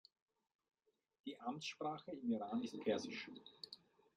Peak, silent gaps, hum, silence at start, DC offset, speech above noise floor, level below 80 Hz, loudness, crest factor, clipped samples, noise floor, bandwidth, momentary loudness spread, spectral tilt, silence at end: -28 dBFS; none; none; 1.25 s; under 0.1%; 19 dB; -90 dBFS; -46 LUFS; 20 dB; under 0.1%; -64 dBFS; 10.5 kHz; 13 LU; -4.5 dB/octave; 0.4 s